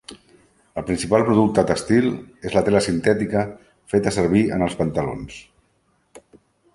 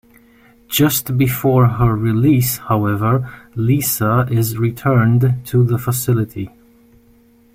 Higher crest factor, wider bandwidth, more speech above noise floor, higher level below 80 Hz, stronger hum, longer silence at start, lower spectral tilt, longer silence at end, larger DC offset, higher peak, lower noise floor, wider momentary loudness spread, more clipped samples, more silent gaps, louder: first, 20 dB vs 14 dB; second, 11.5 kHz vs 16.5 kHz; first, 45 dB vs 35 dB; about the same, -46 dBFS vs -42 dBFS; neither; second, 0.1 s vs 0.7 s; about the same, -6 dB/octave vs -6 dB/octave; second, 0.55 s vs 1.05 s; neither; about the same, -2 dBFS vs -2 dBFS; first, -65 dBFS vs -50 dBFS; first, 14 LU vs 6 LU; neither; neither; second, -20 LUFS vs -16 LUFS